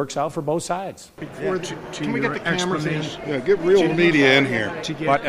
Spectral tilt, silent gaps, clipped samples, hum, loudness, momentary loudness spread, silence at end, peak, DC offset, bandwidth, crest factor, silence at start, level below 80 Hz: -5 dB/octave; none; under 0.1%; none; -21 LUFS; 13 LU; 0 s; -4 dBFS; under 0.1%; 14.5 kHz; 16 dB; 0 s; -54 dBFS